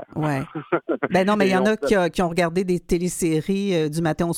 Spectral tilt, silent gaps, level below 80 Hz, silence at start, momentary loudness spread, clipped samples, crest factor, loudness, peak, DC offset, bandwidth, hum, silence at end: -5.5 dB/octave; none; -44 dBFS; 0 s; 6 LU; under 0.1%; 16 dB; -22 LUFS; -6 dBFS; under 0.1%; 16 kHz; none; 0 s